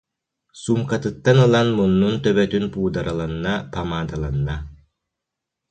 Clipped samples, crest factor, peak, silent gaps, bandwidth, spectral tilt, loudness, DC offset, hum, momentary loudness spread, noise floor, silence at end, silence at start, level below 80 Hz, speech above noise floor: under 0.1%; 18 dB; -2 dBFS; none; 9 kHz; -7 dB/octave; -20 LUFS; under 0.1%; none; 11 LU; -83 dBFS; 0.95 s; 0.55 s; -40 dBFS; 64 dB